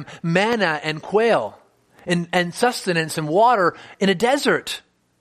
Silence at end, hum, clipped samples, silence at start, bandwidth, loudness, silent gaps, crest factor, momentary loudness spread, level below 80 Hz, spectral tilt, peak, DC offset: 0.4 s; none; under 0.1%; 0 s; 15 kHz; -20 LUFS; none; 20 dB; 8 LU; -62 dBFS; -4.5 dB/octave; -2 dBFS; under 0.1%